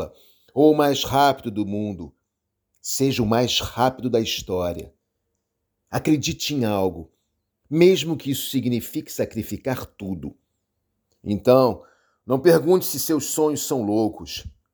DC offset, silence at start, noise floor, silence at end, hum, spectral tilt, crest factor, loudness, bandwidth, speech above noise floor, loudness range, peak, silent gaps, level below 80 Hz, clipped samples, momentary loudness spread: under 0.1%; 0 s; -79 dBFS; 0.25 s; none; -5 dB/octave; 20 dB; -22 LUFS; over 20 kHz; 58 dB; 5 LU; -2 dBFS; none; -50 dBFS; under 0.1%; 16 LU